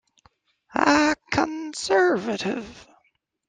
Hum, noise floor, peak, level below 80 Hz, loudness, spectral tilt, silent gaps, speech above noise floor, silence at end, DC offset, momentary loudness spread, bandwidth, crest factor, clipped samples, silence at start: none; -69 dBFS; -2 dBFS; -56 dBFS; -23 LUFS; -4 dB/octave; none; 47 dB; 0.65 s; under 0.1%; 12 LU; 9.6 kHz; 22 dB; under 0.1%; 0.75 s